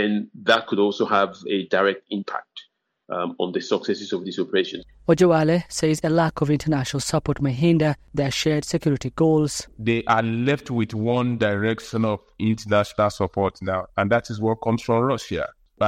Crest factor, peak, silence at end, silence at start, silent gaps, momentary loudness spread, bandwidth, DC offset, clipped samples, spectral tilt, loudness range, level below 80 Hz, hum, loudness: 18 dB; -4 dBFS; 0 s; 0 s; none; 9 LU; 15.5 kHz; under 0.1%; under 0.1%; -5.5 dB/octave; 3 LU; -50 dBFS; none; -22 LUFS